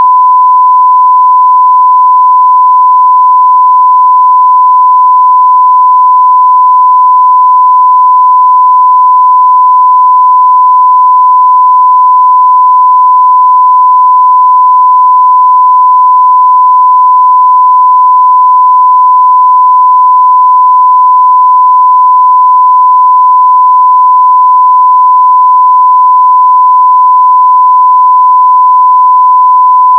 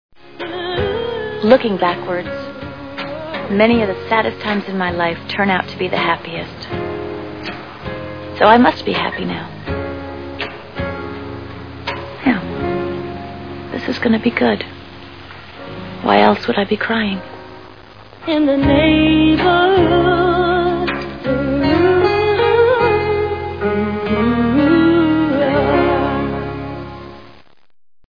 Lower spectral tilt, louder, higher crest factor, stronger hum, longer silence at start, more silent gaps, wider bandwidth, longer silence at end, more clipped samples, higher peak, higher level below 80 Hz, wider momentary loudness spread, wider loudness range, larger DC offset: second, -2.5 dB/octave vs -8 dB/octave; first, -3 LUFS vs -16 LUFS; second, 4 dB vs 16 dB; neither; second, 0 s vs 0.25 s; neither; second, 1.2 kHz vs 5.4 kHz; second, 0 s vs 0.8 s; first, 0.5% vs under 0.1%; about the same, 0 dBFS vs 0 dBFS; second, under -90 dBFS vs -38 dBFS; second, 0 LU vs 17 LU; second, 0 LU vs 7 LU; second, under 0.1% vs 0.5%